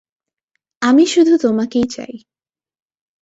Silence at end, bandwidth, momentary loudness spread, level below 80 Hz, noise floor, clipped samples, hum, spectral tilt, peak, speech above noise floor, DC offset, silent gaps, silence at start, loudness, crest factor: 1.05 s; 8 kHz; 14 LU; -56 dBFS; -74 dBFS; under 0.1%; none; -4.5 dB/octave; -2 dBFS; 60 dB; under 0.1%; none; 0.8 s; -14 LUFS; 14 dB